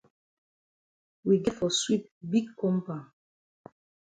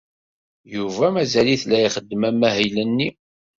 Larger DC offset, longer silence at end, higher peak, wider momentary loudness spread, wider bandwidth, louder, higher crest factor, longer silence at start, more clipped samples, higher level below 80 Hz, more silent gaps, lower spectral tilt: neither; first, 1.15 s vs 0.5 s; second, -12 dBFS vs -4 dBFS; about the same, 10 LU vs 9 LU; first, 9.4 kHz vs 7.8 kHz; second, -28 LUFS vs -20 LUFS; about the same, 20 dB vs 18 dB; first, 1.25 s vs 0.7 s; neither; second, -64 dBFS vs -56 dBFS; first, 2.11-2.21 s vs none; about the same, -5 dB/octave vs -5 dB/octave